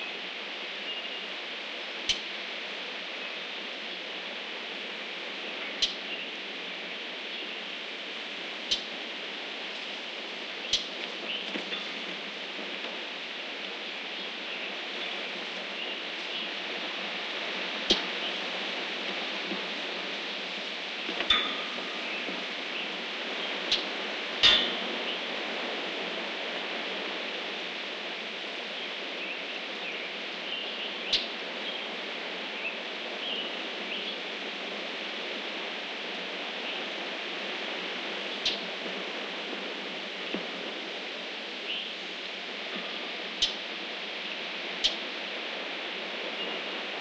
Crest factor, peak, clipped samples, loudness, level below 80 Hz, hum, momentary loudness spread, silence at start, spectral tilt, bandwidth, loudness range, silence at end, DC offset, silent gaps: 28 dB; -8 dBFS; under 0.1%; -32 LUFS; -68 dBFS; none; 7 LU; 0 s; -1.5 dB/octave; 10 kHz; 7 LU; 0 s; under 0.1%; none